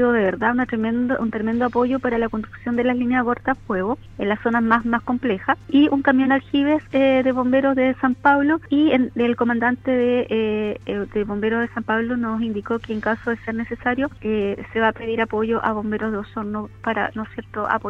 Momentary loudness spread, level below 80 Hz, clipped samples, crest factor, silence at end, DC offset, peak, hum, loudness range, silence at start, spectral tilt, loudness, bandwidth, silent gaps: 8 LU; -48 dBFS; under 0.1%; 18 dB; 0 s; under 0.1%; -2 dBFS; none; 5 LU; 0 s; -8 dB/octave; -21 LUFS; 5.4 kHz; none